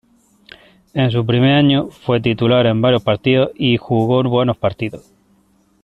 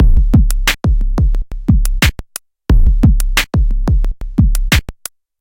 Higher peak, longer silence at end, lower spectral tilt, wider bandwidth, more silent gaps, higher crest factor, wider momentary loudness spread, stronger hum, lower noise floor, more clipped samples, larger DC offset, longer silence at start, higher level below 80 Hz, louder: about the same, -2 dBFS vs 0 dBFS; first, 0.85 s vs 0.5 s; first, -8.5 dB/octave vs -5 dB/octave; second, 5.2 kHz vs 17 kHz; neither; about the same, 16 dB vs 12 dB; second, 7 LU vs 14 LU; neither; first, -56 dBFS vs -34 dBFS; neither; neither; first, 0.95 s vs 0 s; second, -48 dBFS vs -12 dBFS; about the same, -16 LUFS vs -15 LUFS